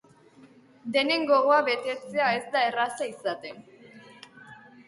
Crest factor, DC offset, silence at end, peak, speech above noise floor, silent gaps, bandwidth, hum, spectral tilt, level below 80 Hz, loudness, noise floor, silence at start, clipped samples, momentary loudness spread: 18 dB; under 0.1%; 0.35 s; -10 dBFS; 29 dB; none; 11.5 kHz; none; -3.5 dB/octave; -78 dBFS; -25 LUFS; -55 dBFS; 0.85 s; under 0.1%; 16 LU